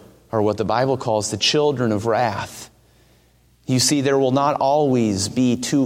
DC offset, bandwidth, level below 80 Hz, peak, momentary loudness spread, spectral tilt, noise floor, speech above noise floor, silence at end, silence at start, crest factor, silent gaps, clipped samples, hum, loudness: under 0.1%; 16 kHz; -56 dBFS; -4 dBFS; 7 LU; -4.5 dB/octave; -56 dBFS; 37 dB; 0 s; 0.35 s; 16 dB; none; under 0.1%; none; -19 LUFS